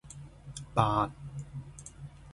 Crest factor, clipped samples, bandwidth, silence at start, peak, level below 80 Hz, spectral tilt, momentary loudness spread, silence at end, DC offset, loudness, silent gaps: 26 dB; under 0.1%; 11.5 kHz; 0.05 s; -8 dBFS; -52 dBFS; -6 dB/octave; 20 LU; 0 s; under 0.1%; -32 LUFS; none